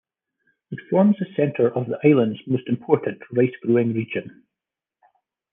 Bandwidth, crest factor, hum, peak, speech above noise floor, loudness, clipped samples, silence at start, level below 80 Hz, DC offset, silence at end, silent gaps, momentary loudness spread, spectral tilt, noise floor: 3.7 kHz; 20 dB; none; -2 dBFS; 67 dB; -21 LUFS; under 0.1%; 0.7 s; -70 dBFS; under 0.1%; 1.25 s; none; 9 LU; -11 dB/octave; -87 dBFS